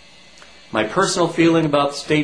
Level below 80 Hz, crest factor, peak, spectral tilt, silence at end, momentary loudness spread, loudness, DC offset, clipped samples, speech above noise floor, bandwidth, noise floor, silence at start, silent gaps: -52 dBFS; 16 dB; -2 dBFS; -4.5 dB/octave; 0 s; 7 LU; -18 LUFS; 0.3%; under 0.1%; 28 dB; 10.5 kHz; -46 dBFS; 0.75 s; none